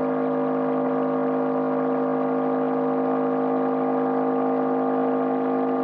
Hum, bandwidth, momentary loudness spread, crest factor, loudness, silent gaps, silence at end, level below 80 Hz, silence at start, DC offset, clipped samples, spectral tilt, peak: none; 4.2 kHz; 1 LU; 10 dB; -23 LUFS; none; 0 s; -90 dBFS; 0 s; under 0.1%; under 0.1%; -7 dB/octave; -12 dBFS